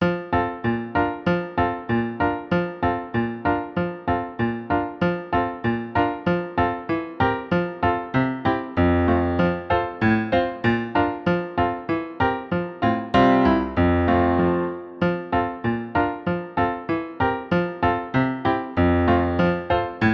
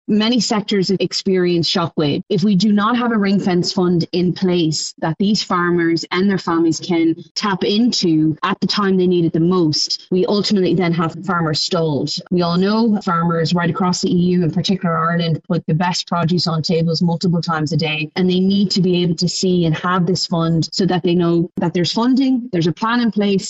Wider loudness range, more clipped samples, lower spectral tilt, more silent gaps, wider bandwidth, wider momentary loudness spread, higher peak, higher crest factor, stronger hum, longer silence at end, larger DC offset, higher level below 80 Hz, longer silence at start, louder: first, 4 LU vs 1 LU; neither; first, -9 dB/octave vs -5.5 dB/octave; second, none vs 7.31-7.35 s; second, 6.4 kHz vs 8.2 kHz; first, 7 LU vs 4 LU; about the same, -6 dBFS vs -6 dBFS; about the same, 16 dB vs 12 dB; neither; about the same, 0 s vs 0 s; neither; first, -42 dBFS vs -52 dBFS; about the same, 0 s vs 0.1 s; second, -23 LUFS vs -17 LUFS